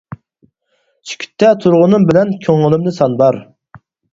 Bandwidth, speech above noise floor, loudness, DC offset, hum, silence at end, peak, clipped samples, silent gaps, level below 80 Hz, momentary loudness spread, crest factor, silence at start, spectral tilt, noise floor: 7.8 kHz; 51 dB; -12 LUFS; under 0.1%; none; 0.35 s; 0 dBFS; under 0.1%; none; -52 dBFS; 16 LU; 14 dB; 0.1 s; -7.5 dB/octave; -63 dBFS